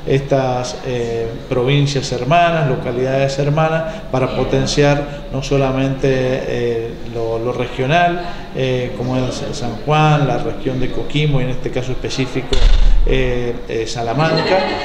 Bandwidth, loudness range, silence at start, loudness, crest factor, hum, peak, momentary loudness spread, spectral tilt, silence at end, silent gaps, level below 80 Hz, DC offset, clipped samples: 9.8 kHz; 3 LU; 0 s; -17 LUFS; 16 dB; none; 0 dBFS; 8 LU; -6 dB/octave; 0 s; none; -22 dBFS; under 0.1%; under 0.1%